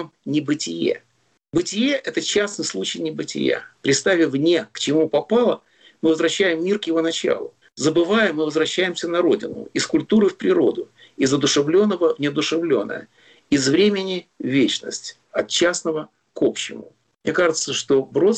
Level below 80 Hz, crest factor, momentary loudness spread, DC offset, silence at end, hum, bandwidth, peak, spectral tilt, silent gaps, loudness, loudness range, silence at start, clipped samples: -60 dBFS; 12 dB; 10 LU; under 0.1%; 0 s; none; 9.2 kHz; -8 dBFS; -4 dB/octave; none; -20 LUFS; 3 LU; 0 s; under 0.1%